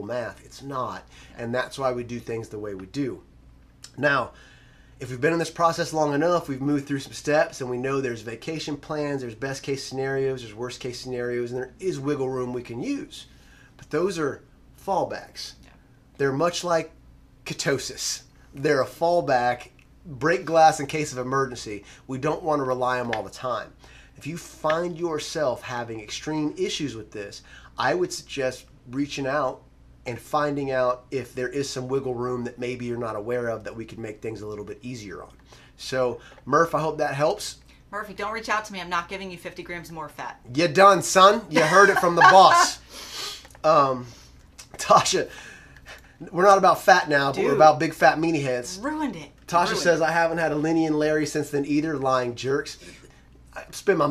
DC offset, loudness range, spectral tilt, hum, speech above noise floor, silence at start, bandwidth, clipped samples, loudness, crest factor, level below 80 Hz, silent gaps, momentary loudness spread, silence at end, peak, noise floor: under 0.1%; 11 LU; -4 dB/octave; none; 30 dB; 0 s; 15 kHz; under 0.1%; -23 LUFS; 24 dB; -54 dBFS; none; 19 LU; 0 s; 0 dBFS; -53 dBFS